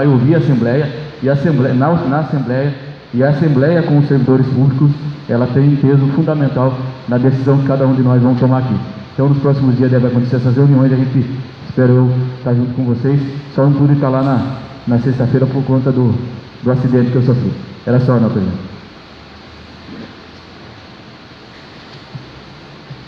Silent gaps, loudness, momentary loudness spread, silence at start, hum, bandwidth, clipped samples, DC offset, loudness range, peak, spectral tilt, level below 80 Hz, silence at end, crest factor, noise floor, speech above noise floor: none; -13 LUFS; 13 LU; 0 s; none; 5.8 kHz; under 0.1%; under 0.1%; 7 LU; 0 dBFS; -10 dB/octave; -48 dBFS; 0.05 s; 12 dB; -36 dBFS; 24 dB